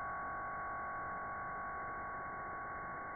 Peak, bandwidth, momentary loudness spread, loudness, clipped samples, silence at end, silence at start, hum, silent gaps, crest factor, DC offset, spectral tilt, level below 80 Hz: -34 dBFS; 2.4 kHz; 2 LU; -43 LUFS; under 0.1%; 0 s; 0 s; none; none; 8 dB; under 0.1%; 1 dB/octave; -62 dBFS